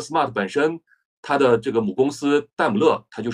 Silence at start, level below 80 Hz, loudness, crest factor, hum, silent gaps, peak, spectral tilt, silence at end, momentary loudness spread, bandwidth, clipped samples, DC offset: 0 s; -62 dBFS; -21 LUFS; 16 dB; none; 1.05-1.23 s; -4 dBFS; -5.5 dB/octave; 0 s; 7 LU; 11 kHz; under 0.1%; under 0.1%